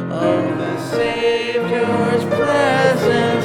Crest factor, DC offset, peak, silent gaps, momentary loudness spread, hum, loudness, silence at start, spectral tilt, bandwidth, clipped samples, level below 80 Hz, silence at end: 14 dB; under 0.1%; -2 dBFS; none; 5 LU; none; -17 LUFS; 0 s; -6 dB/octave; 15 kHz; under 0.1%; -52 dBFS; 0 s